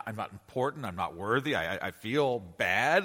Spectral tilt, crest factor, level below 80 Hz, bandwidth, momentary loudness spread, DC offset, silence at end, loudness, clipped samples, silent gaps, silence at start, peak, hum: -5 dB/octave; 18 dB; -64 dBFS; 16.5 kHz; 9 LU; under 0.1%; 0 s; -31 LUFS; under 0.1%; none; 0 s; -12 dBFS; none